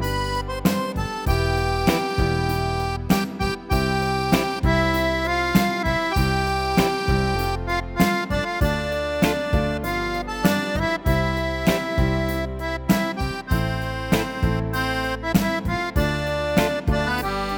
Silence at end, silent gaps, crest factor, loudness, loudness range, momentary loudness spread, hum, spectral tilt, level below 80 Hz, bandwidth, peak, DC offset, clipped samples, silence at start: 0 s; none; 20 dB; -22 LUFS; 2 LU; 5 LU; none; -5.5 dB/octave; -30 dBFS; 19 kHz; -2 dBFS; under 0.1%; under 0.1%; 0 s